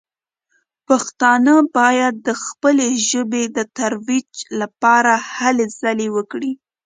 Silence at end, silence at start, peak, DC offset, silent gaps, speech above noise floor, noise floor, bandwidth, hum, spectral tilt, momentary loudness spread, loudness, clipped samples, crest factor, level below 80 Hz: 0.3 s; 0.9 s; 0 dBFS; under 0.1%; none; 55 dB; -71 dBFS; 9.6 kHz; none; -2.5 dB/octave; 11 LU; -17 LUFS; under 0.1%; 16 dB; -68 dBFS